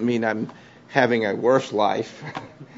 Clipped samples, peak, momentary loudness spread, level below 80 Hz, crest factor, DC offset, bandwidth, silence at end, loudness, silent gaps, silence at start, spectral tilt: under 0.1%; -2 dBFS; 15 LU; -68 dBFS; 22 dB; under 0.1%; 7.8 kHz; 0 s; -22 LUFS; none; 0 s; -6 dB/octave